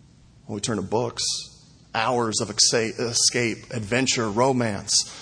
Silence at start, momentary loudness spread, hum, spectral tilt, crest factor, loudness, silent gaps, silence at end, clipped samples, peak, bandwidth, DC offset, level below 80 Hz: 0.5 s; 11 LU; none; -2.5 dB/octave; 20 dB; -22 LUFS; none; 0 s; under 0.1%; -4 dBFS; 10.5 kHz; under 0.1%; -56 dBFS